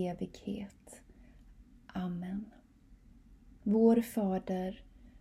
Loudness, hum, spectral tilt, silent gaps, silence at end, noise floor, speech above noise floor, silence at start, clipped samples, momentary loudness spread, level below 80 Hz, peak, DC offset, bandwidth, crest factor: -34 LUFS; none; -7.5 dB/octave; none; 0 s; -60 dBFS; 27 dB; 0 s; under 0.1%; 26 LU; -60 dBFS; -16 dBFS; under 0.1%; 15.5 kHz; 20 dB